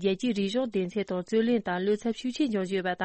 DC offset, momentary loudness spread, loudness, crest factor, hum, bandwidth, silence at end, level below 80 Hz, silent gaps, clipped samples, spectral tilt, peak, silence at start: under 0.1%; 4 LU; -29 LUFS; 12 dB; none; 8.8 kHz; 0 s; -66 dBFS; none; under 0.1%; -6 dB/octave; -14 dBFS; 0 s